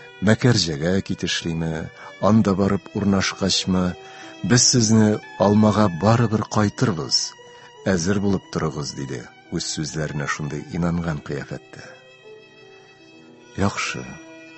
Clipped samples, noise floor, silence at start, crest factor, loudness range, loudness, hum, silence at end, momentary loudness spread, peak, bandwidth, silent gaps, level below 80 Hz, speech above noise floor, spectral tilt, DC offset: under 0.1%; -47 dBFS; 0 s; 20 dB; 11 LU; -21 LUFS; none; 0 s; 15 LU; 0 dBFS; 8.4 kHz; none; -44 dBFS; 27 dB; -4.5 dB/octave; under 0.1%